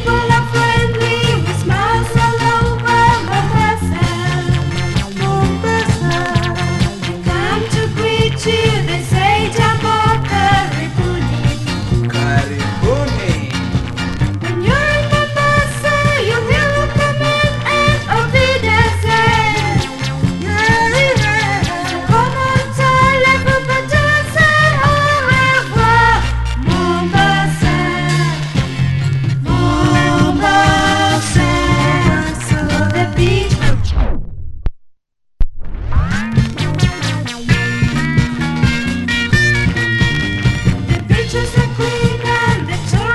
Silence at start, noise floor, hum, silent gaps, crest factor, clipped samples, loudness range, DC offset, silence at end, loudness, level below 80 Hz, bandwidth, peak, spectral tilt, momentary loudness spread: 0 s; -54 dBFS; none; none; 14 dB; under 0.1%; 5 LU; under 0.1%; 0 s; -14 LUFS; -24 dBFS; 12.5 kHz; 0 dBFS; -5.5 dB/octave; 7 LU